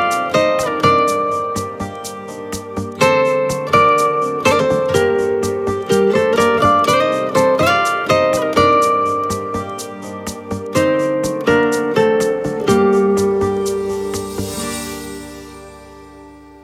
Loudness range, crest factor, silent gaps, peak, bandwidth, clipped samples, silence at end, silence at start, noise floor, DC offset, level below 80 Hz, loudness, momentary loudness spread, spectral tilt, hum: 4 LU; 16 dB; none; 0 dBFS; 16.5 kHz; under 0.1%; 0.05 s; 0 s; -39 dBFS; under 0.1%; -46 dBFS; -16 LUFS; 14 LU; -4.5 dB/octave; none